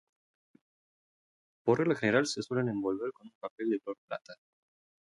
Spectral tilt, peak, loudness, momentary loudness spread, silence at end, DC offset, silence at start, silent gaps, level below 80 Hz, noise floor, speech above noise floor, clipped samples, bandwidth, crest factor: -5.5 dB/octave; -14 dBFS; -32 LUFS; 15 LU; 0.7 s; under 0.1%; 1.65 s; 3.35-3.41 s, 3.50-3.58 s, 3.98-4.08 s; -74 dBFS; under -90 dBFS; over 58 dB; under 0.1%; 11.5 kHz; 22 dB